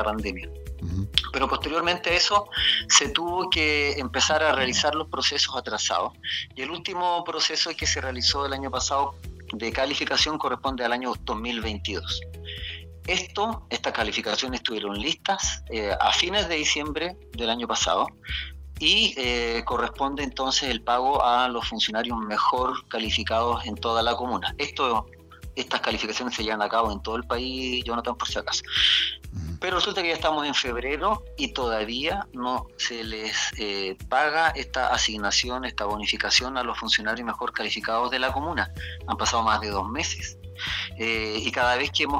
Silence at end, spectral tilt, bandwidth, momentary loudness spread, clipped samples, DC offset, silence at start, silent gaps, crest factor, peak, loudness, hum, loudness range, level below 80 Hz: 0 s; -2 dB/octave; 16 kHz; 9 LU; under 0.1%; under 0.1%; 0 s; none; 26 dB; 0 dBFS; -25 LUFS; none; 5 LU; -42 dBFS